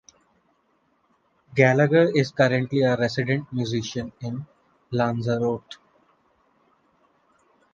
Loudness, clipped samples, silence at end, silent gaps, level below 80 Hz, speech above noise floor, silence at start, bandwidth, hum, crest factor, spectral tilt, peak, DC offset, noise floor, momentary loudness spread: -23 LUFS; under 0.1%; 2 s; none; -60 dBFS; 45 dB; 1.5 s; 7.4 kHz; none; 22 dB; -6.5 dB/octave; -2 dBFS; under 0.1%; -67 dBFS; 15 LU